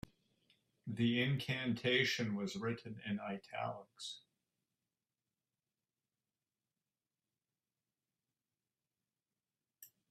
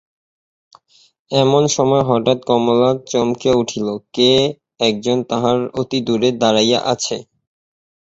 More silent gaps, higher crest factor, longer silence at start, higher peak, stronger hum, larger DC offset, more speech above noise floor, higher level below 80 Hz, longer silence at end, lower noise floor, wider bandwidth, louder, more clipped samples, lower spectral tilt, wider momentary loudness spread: neither; first, 22 dB vs 16 dB; second, 0.85 s vs 1.3 s; second, -20 dBFS vs -2 dBFS; neither; neither; first, over 51 dB vs 35 dB; second, -76 dBFS vs -54 dBFS; second, 0.25 s vs 0.85 s; first, under -90 dBFS vs -51 dBFS; first, 14 kHz vs 8.2 kHz; second, -39 LUFS vs -16 LUFS; neither; about the same, -5 dB/octave vs -4.5 dB/octave; first, 15 LU vs 7 LU